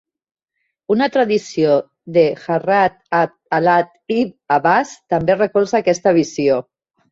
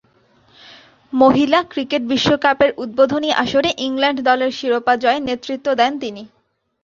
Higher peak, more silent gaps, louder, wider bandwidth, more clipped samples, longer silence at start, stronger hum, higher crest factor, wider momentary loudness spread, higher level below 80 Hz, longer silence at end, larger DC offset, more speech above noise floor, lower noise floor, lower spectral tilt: about the same, -2 dBFS vs -2 dBFS; neither; about the same, -17 LUFS vs -17 LUFS; about the same, 7.8 kHz vs 7.4 kHz; neither; first, 0.9 s vs 0.7 s; neither; about the same, 16 dB vs 16 dB; second, 5 LU vs 8 LU; about the same, -56 dBFS vs -54 dBFS; about the same, 0.5 s vs 0.55 s; neither; first, 58 dB vs 39 dB; first, -73 dBFS vs -55 dBFS; about the same, -5.5 dB/octave vs -4.5 dB/octave